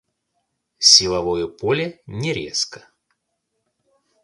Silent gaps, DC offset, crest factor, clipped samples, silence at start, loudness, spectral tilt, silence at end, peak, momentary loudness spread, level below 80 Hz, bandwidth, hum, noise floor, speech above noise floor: none; under 0.1%; 22 dB; under 0.1%; 0.8 s; -17 LUFS; -2 dB/octave; 1.45 s; 0 dBFS; 16 LU; -52 dBFS; 16 kHz; none; -75 dBFS; 56 dB